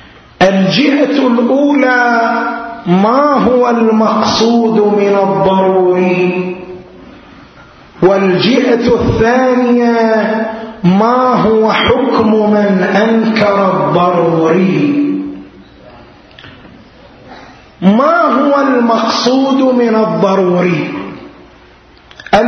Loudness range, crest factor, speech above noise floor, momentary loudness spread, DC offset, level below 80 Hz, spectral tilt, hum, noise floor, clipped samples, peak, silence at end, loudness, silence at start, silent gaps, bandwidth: 4 LU; 10 dB; 31 dB; 6 LU; under 0.1%; -40 dBFS; -6.5 dB/octave; none; -41 dBFS; under 0.1%; 0 dBFS; 0 s; -10 LUFS; 0.4 s; none; 6.6 kHz